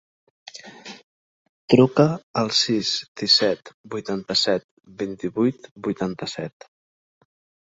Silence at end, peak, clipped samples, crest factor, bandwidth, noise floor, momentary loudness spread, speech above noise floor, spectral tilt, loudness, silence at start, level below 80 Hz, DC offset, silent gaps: 1.25 s; -2 dBFS; under 0.1%; 22 dB; 8 kHz; -41 dBFS; 23 LU; 19 dB; -4.5 dB/octave; -22 LUFS; 0.55 s; -62 dBFS; under 0.1%; 1.04-1.68 s, 2.23-2.34 s, 3.08-3.15 s, 3.74-3.84 s, 4.64-4.77 s, 5.71-5.76 s